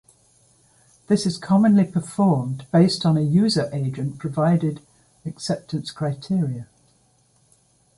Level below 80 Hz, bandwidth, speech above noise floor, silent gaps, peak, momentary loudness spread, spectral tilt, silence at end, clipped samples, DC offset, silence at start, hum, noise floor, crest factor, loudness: -60 dBFS; 11.5 kHz; 41 dB; none; -6 dBFS; 12 LU; -7 dB/octave; 1.35 s; under 0.1%; under 0.1%; 1.1 s; none; -61 dBFS; 18 dB; -21 LUFS